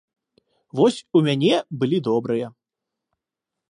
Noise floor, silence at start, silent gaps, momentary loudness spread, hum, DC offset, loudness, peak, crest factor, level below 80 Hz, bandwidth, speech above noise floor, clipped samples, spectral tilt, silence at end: -85 dBFS; 0.75 s; none; 9 LU; none; under 0.1%; -21 LUFS; -6 dBFS; 18 dB; -70 dBFS; 11 kHz; 65 dB; under 0.1%; -6.5 dB/octave; 1.2 s